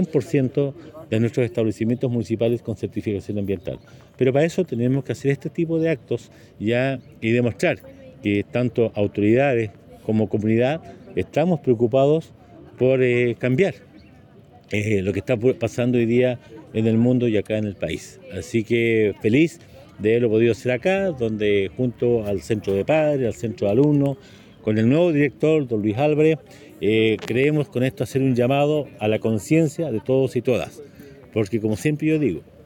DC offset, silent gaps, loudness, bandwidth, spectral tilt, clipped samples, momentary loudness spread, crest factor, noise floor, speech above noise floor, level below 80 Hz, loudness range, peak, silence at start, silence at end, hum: under 0.1%; none; -21 LUFS; 17 kHz; -7.5 dB/octave; under 0.1%; 9 LU; 16 dB; -48 dBFS; 28 dB; -56 dBFS; 3 LU; -4 dBFS; 0 s; 0.25 s; none